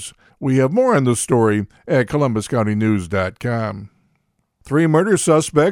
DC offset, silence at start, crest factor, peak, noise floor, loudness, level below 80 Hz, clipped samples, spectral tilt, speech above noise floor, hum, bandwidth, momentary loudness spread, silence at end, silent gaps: under 0.1%; 0 s; 18 dB; 0 dBFS; -67 dBFS; -18 LUFS; -50 dBFS; under 0.1%; -6 dB/octave; 50 dB; none; 16.5 kHz; 8 LU; 0 s; none